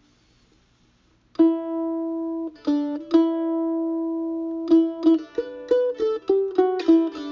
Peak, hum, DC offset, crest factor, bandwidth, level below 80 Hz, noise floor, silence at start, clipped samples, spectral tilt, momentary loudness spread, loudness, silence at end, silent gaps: -6 dBFS; none; under 0.1%; 16 dB; 6.4 kHz; -64 dBFS; -61 dBFS; 1.4 s; under 0.1%; -6.5 dB/octave; 9 LU; -23 LUFS; 0 s; none